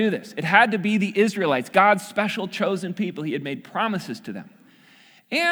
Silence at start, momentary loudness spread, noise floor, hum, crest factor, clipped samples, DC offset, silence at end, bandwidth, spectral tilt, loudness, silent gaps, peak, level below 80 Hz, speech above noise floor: 0 s; 12 LU; -53 dBFS; none; 22 dB; under 0.1%; under 0.1%; 0 s; over 20 kHz; -5 dB/octave; -22 LUFS; none; -2 dBFS; -74 dBFS; 31 dB